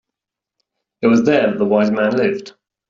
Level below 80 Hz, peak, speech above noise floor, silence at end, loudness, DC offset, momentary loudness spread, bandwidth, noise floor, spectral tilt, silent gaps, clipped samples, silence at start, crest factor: -60 dBFS; -2 dBFS; 68 dB; 0.4 s; -16 LUFS; under 0.1%; 7 LU; 7.4 kHz; -83 dBFS; -6.5 dB/octave; none; under 0.1%; 1 s; 16 dB